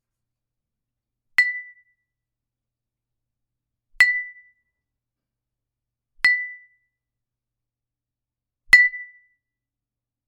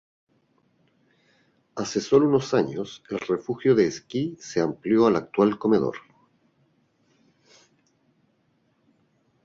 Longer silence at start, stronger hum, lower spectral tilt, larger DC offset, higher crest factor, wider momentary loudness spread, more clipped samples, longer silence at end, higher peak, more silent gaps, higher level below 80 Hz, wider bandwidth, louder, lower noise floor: second, 1.4 s vs 1.75 s; neither; second, 1.5 dB/octave vs -6 dB/octave; neither; first, 26 dB vs 20 dB; first, 20 LU vs 13 LU; neither; second, 1.25 s vs 3.45 s; first, 0 dBFS vs -6 dBFS; neither; about the same, -62 dBFS vs -64 dBFS; first, 10 kHz vs 7.6 kHz; first, -18 LUFS vs -24 LUFS; first, -87 dBFS vs -68 dBFS